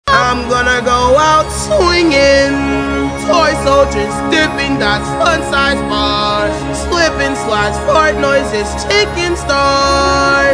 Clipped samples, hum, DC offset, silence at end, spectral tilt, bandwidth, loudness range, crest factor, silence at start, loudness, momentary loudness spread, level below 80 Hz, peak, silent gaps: under 0.1%; none; under 0.1%; 0 s; -4 dB/octave; 10.5 kHz; 2 LU; 12 dB; 0.05 s; -12 LUFS; 6 LU; -26 dBFS; 0 dBFS; none